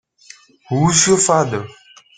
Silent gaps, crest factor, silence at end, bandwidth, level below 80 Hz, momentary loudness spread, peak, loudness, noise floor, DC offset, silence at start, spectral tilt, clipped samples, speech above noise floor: none; 18 dB; 0.45 s; 10 kHz; -50 dBFS; 14 LU; 0 dBFS; -14 LUFS; -45 dBFS; under 0.1%; 0.7 s; -3.5 dB/octave; under 0.1%; 30 dB